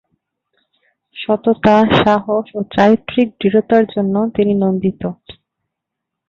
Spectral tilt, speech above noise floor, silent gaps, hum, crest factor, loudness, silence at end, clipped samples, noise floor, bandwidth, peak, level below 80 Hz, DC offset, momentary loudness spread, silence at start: -8 dB/octave; 66 dB; none; none; 16 dB; -15 LUFS; 1 s; under 0.1%; -80 dBFS; 7 kHz; 0 dBFS; -48 dBFS; under 0.1%; 9 LU; 1.15 s